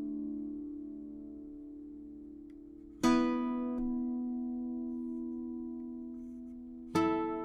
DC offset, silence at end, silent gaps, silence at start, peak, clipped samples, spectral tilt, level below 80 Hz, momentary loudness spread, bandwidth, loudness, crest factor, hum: under 0.1%; 0 s; none; 0 s; -16 dBFS; under 0.1%; -5.5 dB/octave; -58 dBFS; 18 LU; 13 kHz; -36 LUFS; 20 dB; none